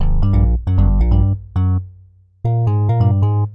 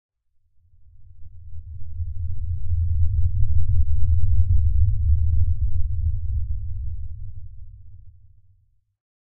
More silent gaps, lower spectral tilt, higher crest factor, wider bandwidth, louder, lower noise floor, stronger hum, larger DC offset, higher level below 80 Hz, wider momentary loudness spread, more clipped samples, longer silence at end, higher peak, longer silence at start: neither; second, -11.5 dB/octave vs -13.5 dB/octave; about the same, 10 dB vs 14 dB; first, 3.7 kHz vs 0.3 kHz; first, -17 LUFS vs -25 LUFS; second, -46 dBFS vs -61 dBFS; neither; neither; first, -18 dBFS vs -26 dBFS; second, 6 LU vs 20 LU; neither; second, 0 s vs 0.25 s; about the same, -6 dBFS vs -6 dBFS; about the same, 0 s vs 0.1 s